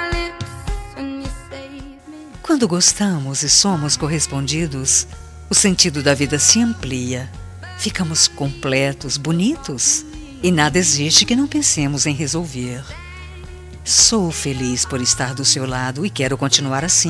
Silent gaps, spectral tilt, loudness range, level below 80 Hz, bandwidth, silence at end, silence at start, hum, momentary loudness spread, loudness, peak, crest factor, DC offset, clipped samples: none; -2.5 dB/octave; 3 LU; -36 dBFS; 14 kHz; 0 s; 0 s; none; 20 LU; -16 LUFS; 0 dBFS; 18 dB; under 0.1%; under 0.1%